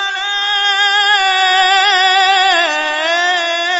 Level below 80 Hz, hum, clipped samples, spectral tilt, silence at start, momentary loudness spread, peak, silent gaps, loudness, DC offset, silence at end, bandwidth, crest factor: -58 dBFS; none; under 0.1%; 2.5 dB/octave; 0 s; 5 LU; -2 dBFS; none; -11 LUFS; under 0.1%; 0 s; 8 kHz; 12 dB